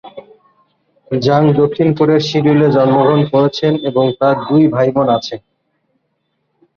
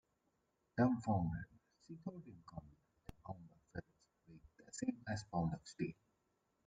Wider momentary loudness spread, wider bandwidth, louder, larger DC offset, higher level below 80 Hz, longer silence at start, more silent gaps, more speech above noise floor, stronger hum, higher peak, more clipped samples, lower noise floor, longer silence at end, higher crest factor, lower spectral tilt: second, 6 LU vs 21 LU; second, 7 kHz vs 9 kHz; first, -13 LUFS vs -43 LUFS; neither; first, -52 dBFS vs -66 dBFS; second, 0.05 s vs 0.75 s; neither; first, 55 dB vs 42 dB; neither; first, -2 dBFS vs -24 dBFS; neither; second, -67 dBFS vs -83 dBFS; first, 1.4 s vs 0.75 s; second, 12 dB vs 22 dB; about the same, -7.5 dB/octave vs -7 dB/octave